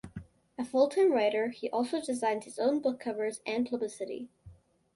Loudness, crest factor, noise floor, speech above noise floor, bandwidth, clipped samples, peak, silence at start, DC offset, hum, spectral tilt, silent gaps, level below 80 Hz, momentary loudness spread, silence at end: -31 LUFS; 18 dB; -56 dBFS; 26 dB; 11.5 kHz; under 0.1%; -14 dBFS; 0.05 s; under 0.1%; none; -4.5 dB/octave; none; -66 dBFS; 17 LU; 0.4 s